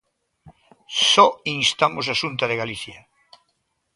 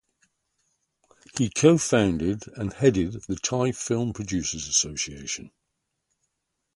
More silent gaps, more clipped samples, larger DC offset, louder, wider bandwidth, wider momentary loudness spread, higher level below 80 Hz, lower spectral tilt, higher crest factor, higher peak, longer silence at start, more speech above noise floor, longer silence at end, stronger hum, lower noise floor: neither; neither; neither; first, -19 LUFS vs -25 LUFS; about the same, 11.5 kHz vs 11.5 kHz; about the same, 15 LU vs 13 LU; second, -62 dBFS vs -50 dBFS; second, -2 dB/octave vs -4.5 dB/octave; about the same, 22 dB vs 22 dB; first, 0 dBFS vs -4 dBFS; second, 0.45 s vs 1.35 s; second, 51 dB vs 55 dB; second, 1 s vs 1.3 s; neither; second, -72 dBFS vs -80 dBFS